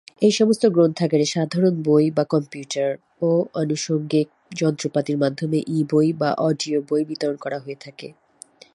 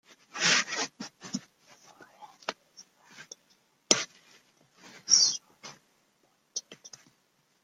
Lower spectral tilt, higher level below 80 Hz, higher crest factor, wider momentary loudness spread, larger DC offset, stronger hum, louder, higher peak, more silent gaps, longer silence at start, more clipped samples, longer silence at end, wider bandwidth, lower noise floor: first, -6 dB/octave vs 0.5 dB/octave; first, -68 dBFS vs -84 dBFS; second, 16 dB vs 32 dB; second, 11 LU vs 27 LU; neither; neither; first, -21 LUFS vs -27 LUFS; about the same, -4 dBFS vs -2 dBFS; neither; second, 0.2 s vs 0.35 s; neither; second, 0.65 s vs 0.9 s; second, 11.5 kHz vs 15.5 kHz; second, -48 dBFS vs -71 dBFS